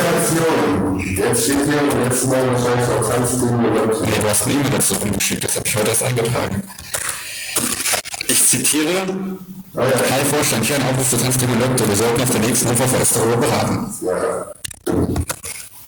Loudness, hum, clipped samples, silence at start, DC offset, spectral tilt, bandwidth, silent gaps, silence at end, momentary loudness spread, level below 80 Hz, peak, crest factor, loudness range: -17 LUFS; none; under 0.1%; 0 s; under 0.1%; -4 dB/octave; over 20 kHz; none; 0 s; 8 LU; -42 dBFS; -2 dBFS; 16 dB; 3 LU